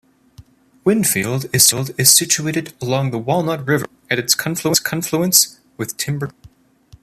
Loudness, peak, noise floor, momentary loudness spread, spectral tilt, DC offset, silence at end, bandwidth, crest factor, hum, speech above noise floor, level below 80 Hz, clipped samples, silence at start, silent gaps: -16 LUFS; 0 dBFS; -49 dBFS; 11 LU; -3 dB/octave; under 0.1%; 0.55 s; 15.5 kHz; 18 dB; none; 31 dB; -54 dBFS; under 0.1%; 0.4 s; none